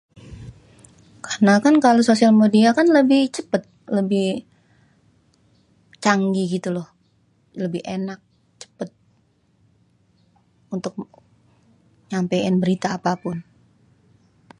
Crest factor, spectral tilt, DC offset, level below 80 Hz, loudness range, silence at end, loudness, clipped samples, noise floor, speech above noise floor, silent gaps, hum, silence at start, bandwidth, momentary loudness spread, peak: 20 dB; -6 dB/octave; under 0.1%; -60 dBFS; 18 LU; 1.2 s; -19 LUFS; under 0.1%; -62 dBFS; 44 dB; none; none; 0.25 s; 11 kHz; 21 LU; -2 dBFS